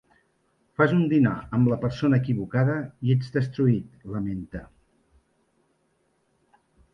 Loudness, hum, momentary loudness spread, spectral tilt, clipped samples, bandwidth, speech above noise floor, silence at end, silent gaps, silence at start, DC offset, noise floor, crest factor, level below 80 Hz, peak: -24 LUFS; none; 13 LU; -9.5 dB/octave; under 0.1%; 6.2 kHz; 46 dB; 2.3 s; none; 0.8 s; under 0.1%; -70 dBFS; 18 dB; -54 dBFS; -6 dBFS